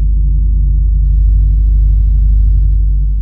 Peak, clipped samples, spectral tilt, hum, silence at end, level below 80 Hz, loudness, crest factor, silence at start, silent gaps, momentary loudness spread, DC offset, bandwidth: -2 dBFS; under 0.1%; -12.5 dB/octave; 50 Hz at -10 dBFS; 0 s; -8 dBFS; -13 LUFS; 6 dB; 0 s; none; 2 LU; 0.2%; 0.4 kHz